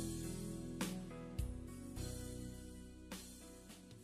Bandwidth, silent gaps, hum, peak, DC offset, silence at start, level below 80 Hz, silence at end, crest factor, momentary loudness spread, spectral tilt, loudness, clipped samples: 15 kHz; none; none; -30 dBFS; under 0.1%; 0 s; -54 dBFS; 0 s; 18 dB; 11 LU; -5 dB/octave; -48 LUFS; under 0.1%